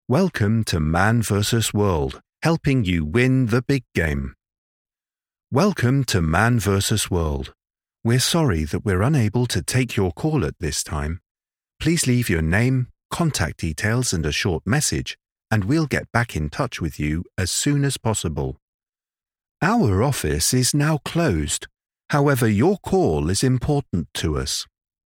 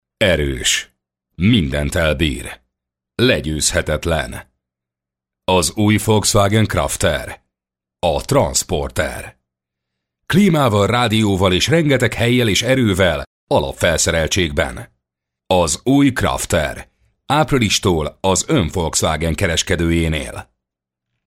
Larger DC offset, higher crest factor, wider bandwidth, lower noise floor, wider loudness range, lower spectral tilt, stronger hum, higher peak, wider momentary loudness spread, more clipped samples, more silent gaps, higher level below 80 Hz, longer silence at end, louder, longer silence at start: neither; first, 22 dB vs 14 dB; about the same, 17.5 kHz vs 16.5 kHz; first, under -90 dBFS vs -86 dBFS; about the same, 3 LU vs 4 LU; about the same, -5 dB/octave vs -4.5 dB/octave; neither; first, 0 dBFS vs -4 dBFS; about the same, 8 LU vs 10 LU; neither; first, 4.58-4.85 s, 11.31-11.35 s, 13.05-13.10 s, 15.32-15.36 s, 18.62-18.79 s, 19.51-19.55 s vs 13.27-13.47 s; second, -38 dBFS vs -32 dBFS; second, 0.4 s vs 0.85 s; second, -21 LUFS vs -16 LUFS; about the same, 0.1 s vs 0.2 s